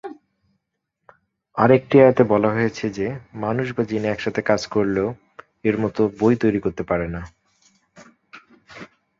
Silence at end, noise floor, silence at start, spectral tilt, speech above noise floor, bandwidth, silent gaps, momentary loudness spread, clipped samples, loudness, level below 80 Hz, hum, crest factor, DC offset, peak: 0.35 s; -78 dBFS; 0.05 s; -7.5 dB/octave; 58 dB; 7.6 kHz; none; 19 LU; under 0.1%; -20 LUFS; -50 dBFS; none; 20 dB; under 0.1%; -2 dBFS